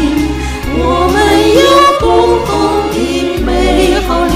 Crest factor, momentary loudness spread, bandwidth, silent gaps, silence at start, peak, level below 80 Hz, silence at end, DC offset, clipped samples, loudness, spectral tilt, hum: 10 dB; 8 LU; 16 kHz; none; 0 s; 0 dBFS; -20 dBFS; 0 s; under 0.1%; 0.3%; -10 LUFS; -5 dB/octave; none